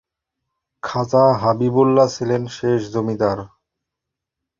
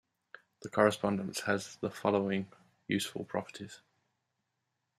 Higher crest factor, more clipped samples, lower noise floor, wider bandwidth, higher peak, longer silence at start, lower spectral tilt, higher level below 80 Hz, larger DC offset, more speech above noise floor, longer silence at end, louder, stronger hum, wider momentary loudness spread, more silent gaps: second, 18 dB vs 26 dB; neither; about the same, -83 dBFS vs -84 dBFS; second, 7.6 kHz vs 14 kHz; first, -2 dBFS vs -10 dBFS; first, 0.85 s vs 0.6 s; first, -7 dB/octave vs -5 dB/octave; first, -54 dBFS vs -76 dBFS; neither; first, 66 dB vs 51 dB; about the same, 1.1 s vs 1.2 s; first, -18 LUFS vs -33 LUFS; neither; second, 10 LU vs 19 LU; neither